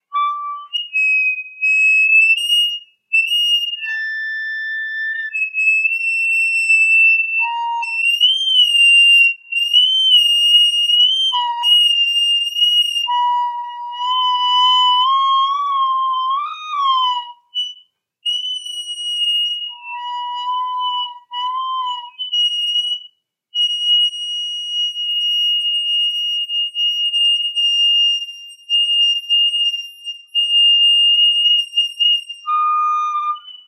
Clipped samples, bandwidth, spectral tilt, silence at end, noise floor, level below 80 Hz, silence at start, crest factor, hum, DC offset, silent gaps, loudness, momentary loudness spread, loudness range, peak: under 0.1%; 15.5 kHz; 9.5 dB/octave; 0.1 s; -51 dBFS; under -90 dBFS; 0.1 s; 14 dB; none; under 0.1%; none; -14 LUFS; 14 LU; 9 LU; -2 dBFS